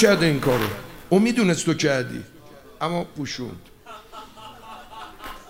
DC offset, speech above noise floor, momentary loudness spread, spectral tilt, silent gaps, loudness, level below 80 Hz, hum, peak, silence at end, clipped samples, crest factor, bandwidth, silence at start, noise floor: 0.2%; 25 dB; 22 LU; -5 dB/octave; none; -22 LUFS; -48 dBFS; none; -2 dBFS; 0 s; under 0.1%; 22 dB; 16 kHz; 0 s; -46 dBFS